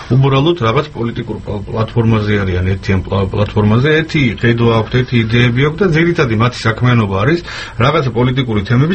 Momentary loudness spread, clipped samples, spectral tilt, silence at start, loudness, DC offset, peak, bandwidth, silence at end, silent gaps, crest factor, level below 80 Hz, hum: 7 LU; under 0.1%; -7.5 dB/octave; 0 s; -13 LUFS; under 0.1%; 0 dBFS; 8.6 kHz; 0 s; none; 12 dB; -34 dBFS; none